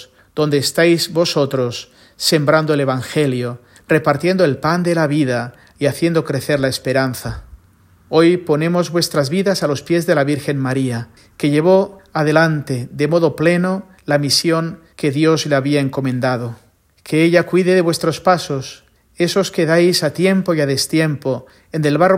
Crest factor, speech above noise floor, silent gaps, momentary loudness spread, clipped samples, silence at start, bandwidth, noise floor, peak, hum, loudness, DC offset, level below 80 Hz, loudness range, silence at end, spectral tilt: 16 dB; 35 dB; none; 10 LU; under 0.1%; 0 s; 16.5 kHz; -50 dBFS; 0 dBFS; none; -16 LUFS; under 0.1%; -50 dBFS; 2 LU; 0 s; -5.5 dB/octave